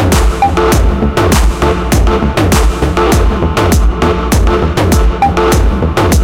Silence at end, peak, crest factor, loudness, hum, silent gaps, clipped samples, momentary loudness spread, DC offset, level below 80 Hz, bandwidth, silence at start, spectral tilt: 0 s; 0 dBFS; 8 dB; -11 LUFS; none; none; under 0.1%; 2 LU; under 0.1%; -12 dBFS; 17 kHz; 0 s; -5.5 dB/octave